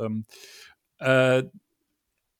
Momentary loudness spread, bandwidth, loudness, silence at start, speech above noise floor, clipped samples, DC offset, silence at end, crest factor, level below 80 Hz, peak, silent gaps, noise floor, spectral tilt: 23 LU; 15.5 kHz; -23 LUFS; 0 s; 54 dB; under 0.1%; under 0.1%; 0.9 s; 20 dB; -76 dBFS; -6 dBFS; none; -78 dBFS; -6 dB/octave